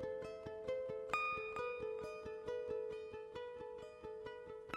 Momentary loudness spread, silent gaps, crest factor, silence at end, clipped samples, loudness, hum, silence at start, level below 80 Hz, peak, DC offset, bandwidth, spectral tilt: 11 LU; none; 24 dB; 0 s; under 0.1%; -45 LUFS; none; 0 s; -70 dBFS; -22 dBFS; under 0.1%; 13 kHz; -5 dB/octave